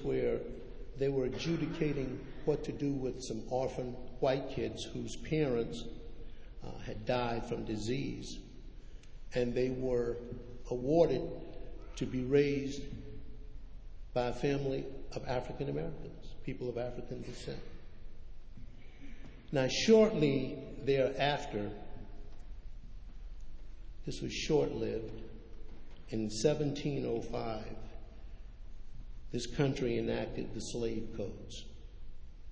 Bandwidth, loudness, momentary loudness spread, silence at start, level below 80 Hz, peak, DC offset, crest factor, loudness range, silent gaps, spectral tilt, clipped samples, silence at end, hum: 8 kHz; -35 LUFS; 23 LU; 0 s; -50 dBFS; -14 dBFS; under 0.1%; 22 dB; 8 LU; none; -6 dB/octave; under 0.1%; 0 s; none